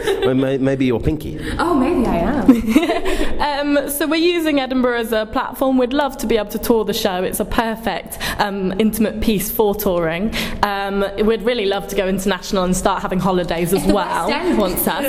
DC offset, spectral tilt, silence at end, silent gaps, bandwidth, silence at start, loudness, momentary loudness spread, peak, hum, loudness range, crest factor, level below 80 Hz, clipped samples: under 0.1%; -5 dB/octave; 0 s; none; 16 kHz; 0 s; -18 LUFS; 4 LU; 0 dBFS; none; 2 LU; 18 dB; -32 dBFS; under 0.1%